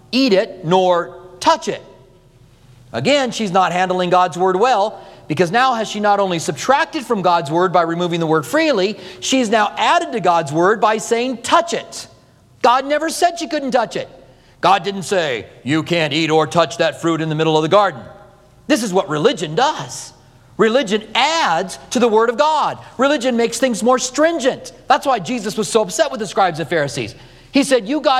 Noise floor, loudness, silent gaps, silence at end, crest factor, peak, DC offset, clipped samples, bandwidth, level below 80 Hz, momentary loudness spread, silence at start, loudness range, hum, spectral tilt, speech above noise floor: -49 dBFS; -17 LUFS; none; 0 s; 16 dB; 0 dBFS; under 0.1%; under 0.1%; 15.5 kHz; -56 dBFS; 8 LU; 0.1 s; 2 LU; none; -4 dB/octave; 32 dB